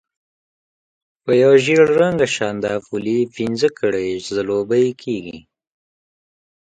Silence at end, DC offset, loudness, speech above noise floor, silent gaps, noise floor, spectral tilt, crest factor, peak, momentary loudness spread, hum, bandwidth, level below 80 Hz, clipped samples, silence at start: 1.25 s; under 0.1%; -17 LUFS; over 73 dB; none; under -90 dBFS; -5.5 dB/octave; 18 dB; 0 dBFS; 13 LU; none; 9.4 kHz; -58 dBFS; under 0.1%; 1.25 s